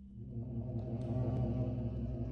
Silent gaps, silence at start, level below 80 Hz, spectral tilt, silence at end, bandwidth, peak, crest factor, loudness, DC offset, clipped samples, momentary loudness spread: none; 0 s; -48 dBFS; -11 dB/octave; 0 s; 4.6 kHz; -24 dBFS; 14 dB; -39 LUFS; under 0.1%; under 0.1%; 7 LU